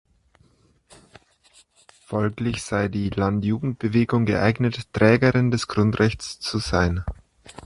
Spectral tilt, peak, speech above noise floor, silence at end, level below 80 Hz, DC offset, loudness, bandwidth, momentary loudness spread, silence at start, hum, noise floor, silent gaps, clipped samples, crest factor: -6.5 dB/octave; -4 dBFS; 38 dB; 0 s; -40 dBFS; under 0.1%; -22 LUFS; 11.5 kHz; 9 LU; 2.1 s; none; -60 dBFS; none; under 0.1%; 20 dB